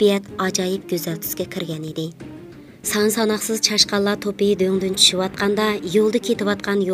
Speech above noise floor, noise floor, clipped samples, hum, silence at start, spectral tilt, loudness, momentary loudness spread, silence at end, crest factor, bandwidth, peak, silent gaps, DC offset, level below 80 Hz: 20 dB; -40 dBFS; under 0.1%; none; 0 s; -3.5 dB/octave; -20 LUFS; 13 LU; 0 s; 20 dB; 16 kHz; 0 dBFS; none; under 0.1%; -56 dBFS